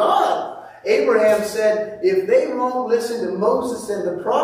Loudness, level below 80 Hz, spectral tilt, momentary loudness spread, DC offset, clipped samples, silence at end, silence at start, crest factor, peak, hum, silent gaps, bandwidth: -19 LUFS; -62 dBFS; -4.5 dB/octave; 8 LU; under 0.1%; under 0.1%; 0 s; 0 s; 14 dB; -4 dBFS; none; none; 16 kHz